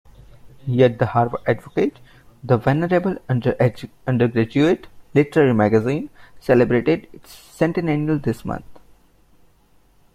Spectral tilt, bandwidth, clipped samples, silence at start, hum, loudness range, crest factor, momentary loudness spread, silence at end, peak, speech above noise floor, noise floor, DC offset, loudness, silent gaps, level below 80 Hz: -8.5 dB/octave; 14.5 kHz; under 0.1%; 0.45 s; none; 3 LU; 18 dB; 11 LU; 1.35 s; -2 dBFS; 36 dB; -55 dBFS; under 0.1%; -20 LUFS; none; -50 dBFS